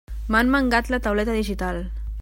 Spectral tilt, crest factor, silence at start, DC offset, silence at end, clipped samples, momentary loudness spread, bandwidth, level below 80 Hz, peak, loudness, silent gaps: -5.5 dB/octave; 18 dB; 0.1 s; under 0.1%; 0 s; under 0.1%; 10 LU; 16.5 kHz; -30 dBFS; -4 dBFS; -22 LUFS; none